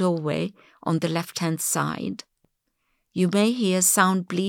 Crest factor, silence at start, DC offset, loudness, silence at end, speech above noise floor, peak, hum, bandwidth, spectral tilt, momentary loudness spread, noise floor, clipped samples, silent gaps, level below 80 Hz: 18 dB; 0 s; under 0.1%; -23 LUFS; 0 s; 50 dB; -6 dBFS; none; 18.5 kHz; -4 dB/octave; 15 LU; -74 dBFS; under 0.1%; none; -74 dBFS